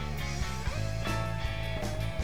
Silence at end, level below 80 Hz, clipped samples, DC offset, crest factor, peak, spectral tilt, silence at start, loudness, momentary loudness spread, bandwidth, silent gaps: 0 s; -38 dBFS; under 0.1%; 1%; 14 dB; -20 dBFS; -5 dB/octave; 0 s; -34 LUFS; 2 LU; 18 kHz; none